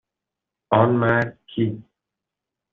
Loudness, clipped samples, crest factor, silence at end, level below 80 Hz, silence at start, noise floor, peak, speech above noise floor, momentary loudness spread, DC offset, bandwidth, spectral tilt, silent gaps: -21 LUFS; under 0.1%; 20 dB; 0.9 s; -58 dBFS; 0.7 s; -86 dBFS; -4 dBFS; 65 dB; 10 LU; under 0.1%; 4.7 kHz; -6 dB/octave; none